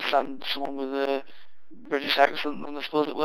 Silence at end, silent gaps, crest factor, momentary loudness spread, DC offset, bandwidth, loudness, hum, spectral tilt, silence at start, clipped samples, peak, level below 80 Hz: 0 s; none; 22 dB; 10 LU; under 0.1%; 18 kHz; -27 LUFS; none; -4 dB/octave; 0 s; under 0.1%; -4 dBFS; -76 dBFS